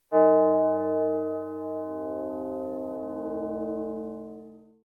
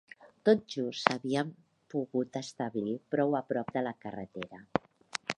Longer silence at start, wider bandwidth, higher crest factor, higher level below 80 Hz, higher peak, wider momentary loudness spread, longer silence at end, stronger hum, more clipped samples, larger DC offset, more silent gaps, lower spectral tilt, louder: about the same, 0.1 s vs 0.2 s; second, 2.7 kHz vs 11 kHz; second, 18 dB vs 30 dB; first, -64 dBFS vs -70 dBFS; second, -8 dBFS vs -2 dBFS; about the same, 15 LU vs 13 LU; first, 0.25 s vs 0.05 s; neither; neither; neither; neither; first, -10 dB/octave vs -5.5 dB/octave; first, -27 LUFS vs -33 LUFS